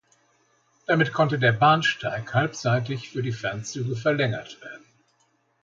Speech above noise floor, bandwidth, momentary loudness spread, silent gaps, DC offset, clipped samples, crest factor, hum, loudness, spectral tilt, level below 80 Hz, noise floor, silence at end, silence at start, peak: 44 dB; 7.6 kHz; 15 LU; none; under 0.1%; under 0.1%; 20 dB; none; -24 LUFS; -5.5 dB/octave; -62 dBFS; -68 dBFS; 0.85 s; 0.9 s; -6 dBFS